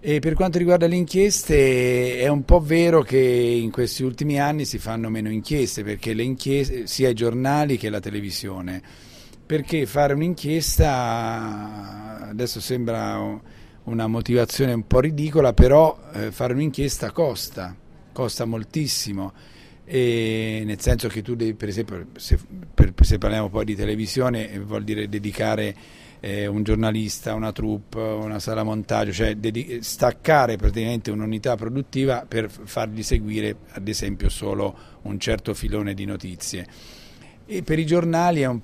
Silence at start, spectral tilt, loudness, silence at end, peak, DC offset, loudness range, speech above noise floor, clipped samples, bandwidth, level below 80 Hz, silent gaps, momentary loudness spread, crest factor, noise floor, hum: 0 s; -5.5 dB/octave; -22 LUFS; 0 s; 0 dBFS; under 0.1%; 7 LU; 24 dB; under 0.1%; 15.5 kHz; -30 dBFS; none; 13 LU; 22 dB; -45 dBFS; none